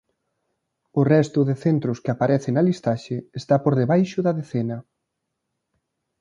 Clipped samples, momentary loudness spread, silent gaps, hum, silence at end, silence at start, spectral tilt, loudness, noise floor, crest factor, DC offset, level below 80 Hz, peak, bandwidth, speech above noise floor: under 0.1%; 10 LU; none; none; 1.4 s; 0.95 s; -8.5 dB/octave; -22 LUFS; -79 dBFS; 18 dB; under 0.1%; -62 dBFS; -4 dBFS; 9.4 kHz; 58 dB